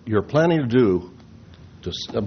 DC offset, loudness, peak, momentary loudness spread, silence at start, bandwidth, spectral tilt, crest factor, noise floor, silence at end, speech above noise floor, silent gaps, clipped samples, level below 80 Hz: under 0.1%; -21 LUFS; -6 dBFS; 16 LU; 0.05 s; 6.6 kHz; -6 dB/octave; 16 dB; -45 dBFS; 0 s; 25 dB; none; under 0.1%; -52 dBFS